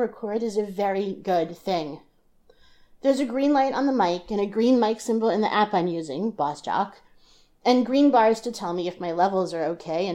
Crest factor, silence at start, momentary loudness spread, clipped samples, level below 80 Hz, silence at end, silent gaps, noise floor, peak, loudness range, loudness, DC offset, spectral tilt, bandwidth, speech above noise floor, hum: 18 dB; 0 s; 9 LU; under 0.1%; -60 dBFS; 0 s; none; -58 dBFS; -8 dBFS; 3 LU; -24 LUFS; under 0.1%; -5.5 dB/octave; 15 kHz; 35 dB; none